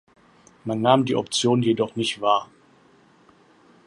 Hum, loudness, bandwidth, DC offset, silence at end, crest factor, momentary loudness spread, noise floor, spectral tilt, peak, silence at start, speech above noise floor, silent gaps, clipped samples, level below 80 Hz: none; -22 LUFS; 11.5 kHz; under 0.1%; 1.4 s; 22 dB; 5 LU; -56 dBFS; -5 dB/octave; -2 dBFS; 0.65 s; 35 dB; none; under 0.1%; -66 dBFS